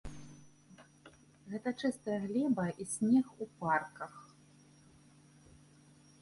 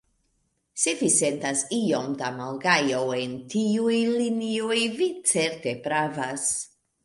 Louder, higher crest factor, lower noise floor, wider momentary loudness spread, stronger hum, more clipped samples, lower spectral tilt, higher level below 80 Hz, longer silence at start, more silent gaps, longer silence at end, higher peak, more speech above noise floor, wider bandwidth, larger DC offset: second, -35 LUFS vs -25 LUFS; about the same, 20 dB vs 20 dB; second, -62 dBFS vs -72 dBFS; first, 23 LU vs 9 LU; neither; neither; first, -5.5 dB/octave vs -3 dB/octave; about the same, -66 dBFS vs -68 dBFS; second, 0.05 s vs 0.75 s; neither; first, 2 s vs 0.4 s; second, -18 dBFS vs -6 dBFS; second, 28 dB vs 47 dB; about the same, 11.5 kHz vs 11.5 kHz; neither